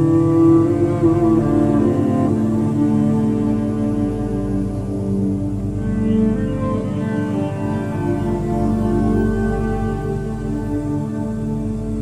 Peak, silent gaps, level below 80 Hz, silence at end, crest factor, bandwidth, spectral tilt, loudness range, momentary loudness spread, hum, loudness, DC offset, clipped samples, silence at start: -4 dBFS; none; -32 dBFS; 0 s; 14 dB; 11.5 kHz; -9.5 dB/octave; 4 LU; 8 LU; 50 Hz at -35 dBFS; -19 LUFS; under 0.1%; under 0.1%; 0 s